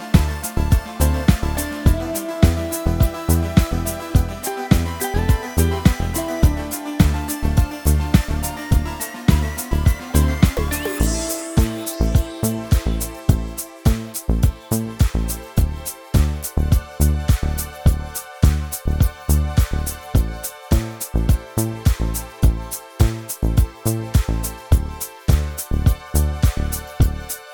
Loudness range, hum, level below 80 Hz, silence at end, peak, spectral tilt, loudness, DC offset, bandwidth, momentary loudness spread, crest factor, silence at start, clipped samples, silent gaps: 2 LU; none; -22 dBFS; 0 s; 0 dBFS; -5.5 dB/octave; -21 LUFS; under 0.1%; over 20 kHz; 6 LU; 18 dB; 0 s; under 0.1%; none